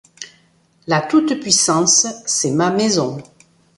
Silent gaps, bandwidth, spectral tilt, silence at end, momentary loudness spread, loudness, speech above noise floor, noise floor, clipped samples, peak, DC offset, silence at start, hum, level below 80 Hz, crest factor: none; 11.5 kHz; -3 dB/octave; 0.55 s; 23 LU; -15 LUFS; 40 dB; -56 dBFS; under 0.1%; -2 dBFS; under 0.1%; 0.2 s; none; -60 dBFS; 18 dB